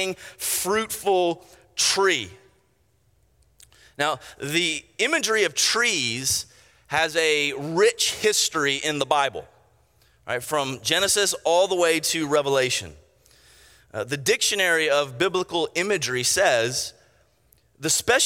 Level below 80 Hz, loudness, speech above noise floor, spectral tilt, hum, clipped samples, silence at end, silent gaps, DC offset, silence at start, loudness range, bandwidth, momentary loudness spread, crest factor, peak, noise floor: -60 dBFS; -22 LUFS; 42 dB; -1.5 dB/octave; none; under 0.1%; 0 s; none; under 0.1%; 0 s; 4 LU; 16.5 kHz; 10 LU; 20 dB; -4 dBFS; -65 dBFS